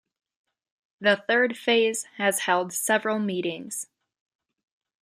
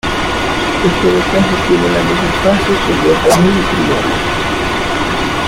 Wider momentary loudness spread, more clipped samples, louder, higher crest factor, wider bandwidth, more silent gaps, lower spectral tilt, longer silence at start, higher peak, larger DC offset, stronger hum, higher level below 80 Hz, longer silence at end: first, 11 LU vs 5 LU; neither; second, -24 LUFS vs -12 LUFS; first, 20 dB vs 12 dB; about the same, 15.5 kHz vs 16.5 kHz; neither; second, -2.5 dB/octave vs -5 dB/octave; first, 1 s vs 0.05 s; second, -8 dBFS vs 0 dBFS; neither; neither; second, -80 dBFS vs -28 dBFS; first, 1.2 s vs 0 s